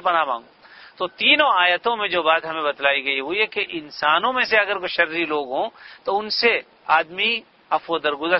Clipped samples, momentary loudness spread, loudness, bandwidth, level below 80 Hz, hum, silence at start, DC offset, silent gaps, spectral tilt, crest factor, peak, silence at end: under 0.1%; 10 LU; -20 LUFS; 6 kHz; -64 dBFS; none; 0 s; under 0.1%; none; -4.5 dB/octave; 20 dB; -2 dBFS; 0 s